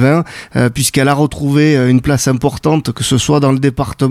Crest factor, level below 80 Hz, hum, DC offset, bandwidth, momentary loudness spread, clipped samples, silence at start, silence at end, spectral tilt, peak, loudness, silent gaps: 12 dB; -36 dBFS; none; under 0.1%; 15.5 kHz; 5 LU; under 0.1%; 0 s; 0 s; -5.5 dB/octave; 0 dBFS; -13 LUFS; none